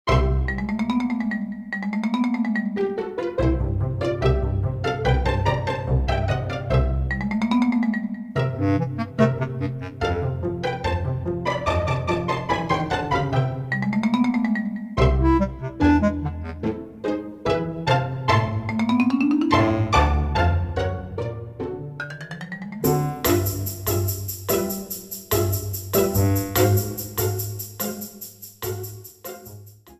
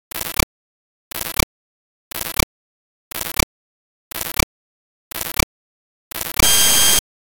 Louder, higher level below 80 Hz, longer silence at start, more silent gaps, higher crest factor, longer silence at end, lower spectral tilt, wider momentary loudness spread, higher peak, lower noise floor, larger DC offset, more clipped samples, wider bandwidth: second, -23 LUFS vs -18 LUFS; about the same, -32 dBFS vs -34 dBFS; about the same, 0.05 s vs 0.15 s; second, none vs 0.43-1.11 s, 1.43-2.11 s, 2.43-3.11 s, 3.43-4.11 s, 4.43-5.11 s, 5.43-6.11 s; about the same, 18 dB vs 22 dB; second, 0.05 s vs 0.3 s; first, -6 dB/octave vs -1 dB/octave; second, 11 LU vs 20 LU; second, -4 dBFS vs 0 dBFS; second, -44 dBFS vs under -90 dBFS; neither; neither; second, 15.5 kHz vs over 20 kHz